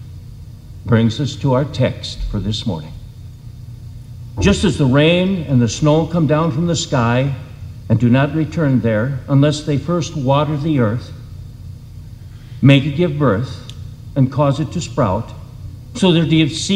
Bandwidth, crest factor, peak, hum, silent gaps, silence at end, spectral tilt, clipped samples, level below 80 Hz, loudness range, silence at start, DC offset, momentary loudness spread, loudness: 11 kHz; 16 dB; 0 dBFS; none; none; 0 s; -6.5 dB/octave; under 0.1%; -36 dBFS; 4 LU; 0 s; under 0.1%; 21 LU; -16 LUFS